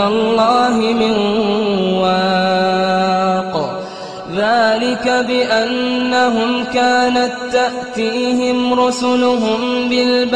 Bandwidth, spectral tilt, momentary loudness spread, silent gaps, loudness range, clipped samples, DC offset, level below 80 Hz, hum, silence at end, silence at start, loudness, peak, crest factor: 10 kHz; -4.5 dB/octave; 6 LU; none; 2 LU; under 0.1%; 0.3%; -52 dBFS; none; 0 s; 0 s; -15 LUFS; -2 dBFS; 12 dB